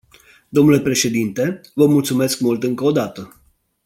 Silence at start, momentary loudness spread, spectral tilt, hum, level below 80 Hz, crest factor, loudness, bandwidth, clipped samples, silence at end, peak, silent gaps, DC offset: 0.55 s; 9 LU; -5 dB/octave; none; -54 dBFS; 16 dB; -17 LUFS; 17 kHz; under 0.1%; 0.6 s; -2 dBFS; none; under 0.1%